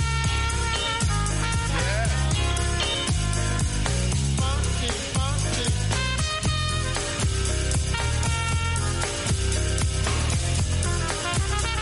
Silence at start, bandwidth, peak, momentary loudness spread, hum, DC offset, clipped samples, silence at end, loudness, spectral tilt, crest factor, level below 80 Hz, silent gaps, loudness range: 0 s; 11.5 kHz; -10 dBFS; 1 LU; none; under 0.1%; under 0.1%; 0 s; -24 LUFS; -3.5 dB/octave; 14 dB; -28 dBFS; none; 1 LU